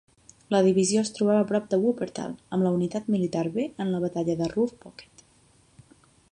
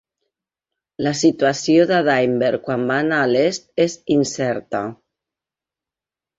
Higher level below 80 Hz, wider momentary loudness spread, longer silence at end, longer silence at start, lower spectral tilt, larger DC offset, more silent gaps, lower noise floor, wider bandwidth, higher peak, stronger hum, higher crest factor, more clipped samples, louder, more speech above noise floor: about the same, -64 dBFS vs -60 dBFS; about the same, 9 LU vs 8 LU; second, 1.3 s vs 1.45 s; second, 0.5 s vs 1 s; about the same, -6 dB/octave vs -5 dB/octave; neither; neither; second, -60 dBFS vs -89 dBFS; first, 10.5 kHz vs 8 kHz; second, -10 dBFS vs -2 dBFS; neither; about the same, 18 dB vs 16 dB; neither; second, -26 LUFS vs -18 LUFS; second, 35 dB vs 71 dB